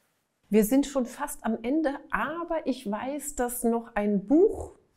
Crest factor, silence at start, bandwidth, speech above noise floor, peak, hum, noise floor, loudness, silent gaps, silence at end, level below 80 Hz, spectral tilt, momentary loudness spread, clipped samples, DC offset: 16 dB; 0.5 s; 16 kHz; 44 dB; -10 dBFS; none; -71 dBFS; -27 LUFS; none; 0.25 s; -52 dBFS; -5.5 dB/octave; 10 LU; under 0.1%; under 0.1%